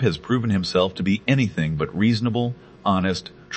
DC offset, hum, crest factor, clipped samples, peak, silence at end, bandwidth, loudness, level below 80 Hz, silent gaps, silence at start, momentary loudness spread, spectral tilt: under 0.1%; none; 18 dB; under 0.1%; -4 dBFS; 0 s; 8.6 kHz; -22 LUFS; -52 dBFS; none; 0 s; 5 LU; -6.5 dB/octave